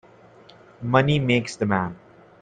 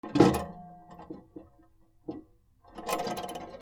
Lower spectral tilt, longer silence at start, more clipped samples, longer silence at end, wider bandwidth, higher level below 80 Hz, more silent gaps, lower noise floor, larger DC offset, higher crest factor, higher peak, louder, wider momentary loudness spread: about the same, -6.5 dB/octave vs -6 dB/octave; first, 0.8 s vs 0.05 s; neither; first, 0.45 s vs 0 s; second, 9.4 kHz vs over 20 kHz; about the same, -56 dBFS vs -56 dBFS; neither; second, -50 dBFS vs -61 dBFS; neither; second, 20 dB vs 26 dB; about the same, -4 dBFS vs -6 dBFS; first, -22 LUFS vs -30 LUFS; second, 11 LU vs 26 LU